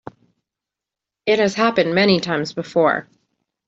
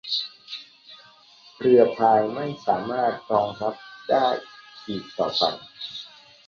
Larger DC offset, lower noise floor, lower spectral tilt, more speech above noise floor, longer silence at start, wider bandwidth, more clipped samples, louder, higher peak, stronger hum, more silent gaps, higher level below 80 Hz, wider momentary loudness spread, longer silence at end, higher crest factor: neither; first, -86 dBFS vs -52 dBFS; about the same, -5.5 dB/octave vs -5.5 dB/octave; first, 69 dB vs 30 dB; first, 1.25 s vs 0.05 s; first, 8 kHz vs 7 kHz; neither; first, -18 LUFS vs -23 LUFS; about the same, -2 dBFS vs -4 dBFS; neither; neither; first, -60 dBFS vs -66 dBFS; second, 7 LU vs 19 LU; first, 0.65 s vs 0.4 s; about the same, 18 dB vs 22 dB